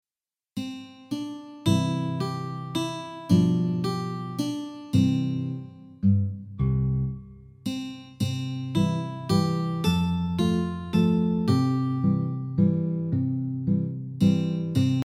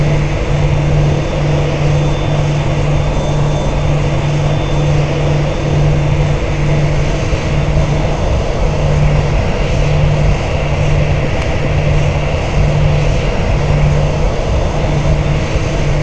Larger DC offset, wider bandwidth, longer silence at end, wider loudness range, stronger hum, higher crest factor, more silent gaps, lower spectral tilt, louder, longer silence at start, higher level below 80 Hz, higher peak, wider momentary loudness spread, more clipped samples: second, under 0.1% vs 4%; first, 15 kHz vs 8.6 kHz; about the same, 0.05 s vs 0 s; first, 4 LU vs 0 LU; neither; first, 18 dB vs 12 dB; neither; about the same, -7.5 dB/octave vs -7 dB/octave; second, -26 LUFS vs -14 LUFS; first, 0.55 s vs 0 s; second, -48 dBFS vs -18 dBFS; second, -8 dBFS vs 0 dBFS; first, 12 LU vs 3 LU; neither